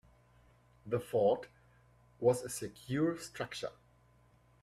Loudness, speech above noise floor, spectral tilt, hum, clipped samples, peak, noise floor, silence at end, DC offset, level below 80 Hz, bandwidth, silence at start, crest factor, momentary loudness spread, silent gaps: -35 LUFS; 32 dB; -5.5 dB/octave; 60 Hz at -60 dBFS; under 0.1%; -18 dBFS; -66 dBFS; 0.9 s; under 0.1%; -68 dBFS; 15.5 kHz; 0.85 s; 20 dB; 13 LU; none